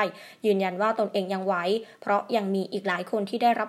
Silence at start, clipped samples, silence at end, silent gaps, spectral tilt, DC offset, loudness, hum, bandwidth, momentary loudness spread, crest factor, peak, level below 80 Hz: 0 s; under 0.1%; 0 s; none; -6 dB/octave; under 0.1%; -27 LUFS; none; 14.5 kHz; 5 LU; 18 dB; -8 dBFS; -86 dBFS